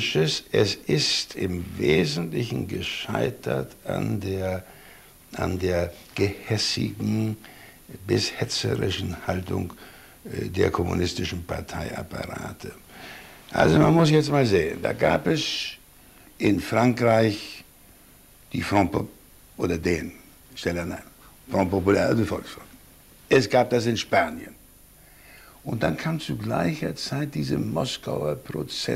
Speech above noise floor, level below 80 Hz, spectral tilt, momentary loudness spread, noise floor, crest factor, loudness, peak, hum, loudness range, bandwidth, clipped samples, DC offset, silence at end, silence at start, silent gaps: 28 dB; -48 dBFS; -5.5 dB/octave; 17 LU; -52 dBFS; 20 dB; -25 LUFS; -4 dBFS; none; 7 LU; 16 kHz; under 0.1%; under 0.1%; 0 s; 0 s; none